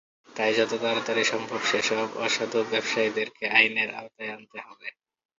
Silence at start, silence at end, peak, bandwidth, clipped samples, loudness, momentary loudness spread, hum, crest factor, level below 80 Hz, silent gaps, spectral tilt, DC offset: 0.3 s; 0.45 s; -2 dBFS; 7.8 kHz; under 0.1%; -25 LUFS; 19 LU; none; 24 dB; -74 dBFS; none; -2.5 dB/octave; under 0.1%